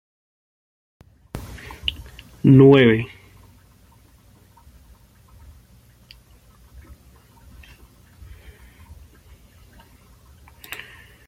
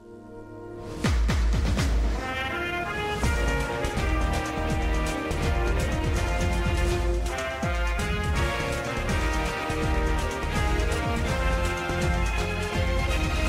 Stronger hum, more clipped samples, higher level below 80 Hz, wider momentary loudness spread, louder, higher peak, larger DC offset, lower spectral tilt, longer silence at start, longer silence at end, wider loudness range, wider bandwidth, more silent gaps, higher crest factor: first, 60 Hz at -50 dBFS vs none; neither; second, -48 dBFS vs -28 dBFS; first, 29 LU vs 3 LU; first, -15 LUFS vs -27 LUFS; first, -2 dBFS vs -12 dBFS; neither; first, -8 dB/octave vs -5 dB/octave; first, 1.35 s vs 0 s; first, 8.2 s vs 0 s; first, 24 LU vs 1 LU; about the same, 15 kHz vs 15.5 kHz; neither; first, 22 dB vs 14 dB